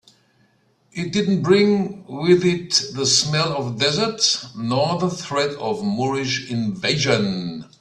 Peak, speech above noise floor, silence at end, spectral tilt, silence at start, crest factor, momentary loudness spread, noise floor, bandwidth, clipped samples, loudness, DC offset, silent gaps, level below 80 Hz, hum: -2 dBFS; 41 dB; 0.15 s; -4 dB/octave; 0.95 s; 18 dB; 8 LU; -61 dBFS; 12 kHz; under 0.1%; -20 LUFS; under 0.1%; none; -58 dBFS; none